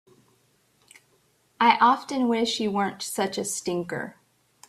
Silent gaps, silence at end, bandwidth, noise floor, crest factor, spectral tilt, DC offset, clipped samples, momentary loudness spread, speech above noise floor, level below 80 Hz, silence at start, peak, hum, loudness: none; 0.6 s; 14.5 kHz; -65 dBFS; 24 dB; -3.5 dB/octave; under 0.1%; under 0.1%; 12 LU; 41 dB; -70 dBFS; 1.6 s; -4 dBFS; none; -24 LUFS